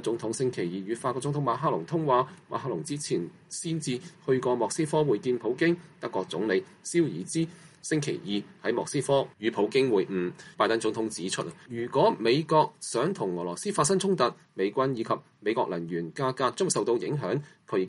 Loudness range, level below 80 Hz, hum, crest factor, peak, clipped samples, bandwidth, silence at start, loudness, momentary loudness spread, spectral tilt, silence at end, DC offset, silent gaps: 3 LU; -72 dBFS; none; 18 dB; -10 dBFS; under 0.1%; 11.5 kHz; 0 s; -28 LUFS; 8 LU; -5 dB/octave; 0 s; under 0.1%; none